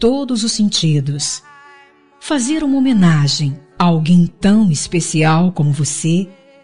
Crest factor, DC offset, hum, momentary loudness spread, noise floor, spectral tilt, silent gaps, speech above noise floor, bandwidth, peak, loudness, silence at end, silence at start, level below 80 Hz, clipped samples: 12 dB; 2%; none; 8 LU; -46 dBFS; -5 dB/octave; none; 32 dB; 11 kHz; -2 dBFS; -15 LUFS; 0 s; 0 s; -44 dBFS; under 0.1%